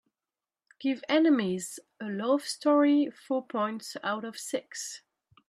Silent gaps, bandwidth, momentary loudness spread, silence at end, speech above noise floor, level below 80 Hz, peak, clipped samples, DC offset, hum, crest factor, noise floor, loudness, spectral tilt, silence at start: none; 14 kHz; 14 LU; 0.5 s; over 62 dB; -80 dBFS; -12 dBFS; under 0.1%; under 0.1%; none; 18 dB; under -90 dBFS; -29 LUFS; -4.5 dB/octave; 0.8 s